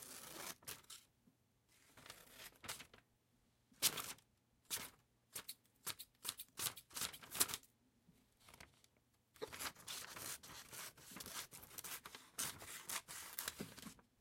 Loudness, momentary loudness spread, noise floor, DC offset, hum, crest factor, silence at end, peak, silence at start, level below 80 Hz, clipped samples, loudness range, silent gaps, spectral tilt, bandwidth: -47 LUFS; 19 LU; -79 dBFS; under 0.1%; none; 36 dB; 0.2 s; -16 dBFS; 0 s; -78 dBFS; under 0.1%; 7 LU; none; -0.5 dB/octave; 16.5 kHz